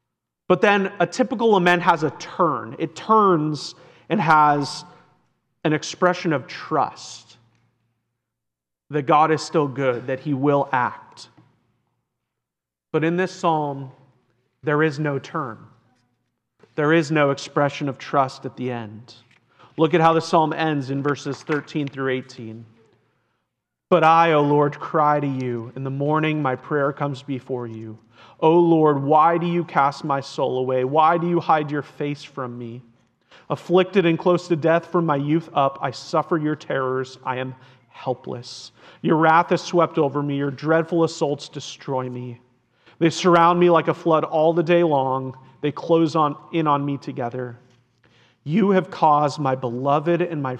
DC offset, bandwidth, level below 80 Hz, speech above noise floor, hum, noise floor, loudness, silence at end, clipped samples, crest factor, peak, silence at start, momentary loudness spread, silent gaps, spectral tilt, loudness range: under 0.1%; 9.4 kHz; -72 dBFS; 65 dB; none; -85 dBFS; -21 LUFS; 0 s; under 0.1%; 18 dB; -2 dBFS; 0.5 s; 14 LU; none; -6.5 dB/octave; 7 LU